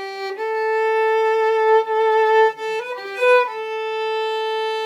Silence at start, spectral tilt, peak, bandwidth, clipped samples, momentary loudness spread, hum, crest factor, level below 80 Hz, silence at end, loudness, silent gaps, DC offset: 0 s; -1 dB/octave; -6 dBFS; 11 kHz; under 0.1%; 10 LU; none; 14 dB; under -90 dBFS; 0 s; -19 LUFS; none; under 0.1%